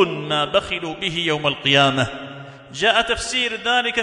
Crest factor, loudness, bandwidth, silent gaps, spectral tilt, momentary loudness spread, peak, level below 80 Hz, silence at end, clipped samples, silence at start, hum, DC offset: 18 dB; -19 LUFS; 11 kHz; none; -3.5 dB/octave; 14 LU; -2 dBFS; -48 dBFS; 0 s; under 0.1%; 0 s; none; under 0.1%